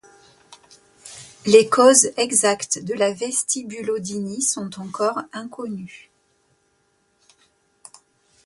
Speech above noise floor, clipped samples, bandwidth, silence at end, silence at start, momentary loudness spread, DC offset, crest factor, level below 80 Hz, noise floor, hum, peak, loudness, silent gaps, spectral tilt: 46 dB; under 0.1%; 12 kHz; 2.5 s; 1.05 s; 21 LU; under 0.1%; 22 dB; -66 dBFS; -66 dBFS; none; 0 dBFS; -19 LUFS; none; -2.5 dB/octave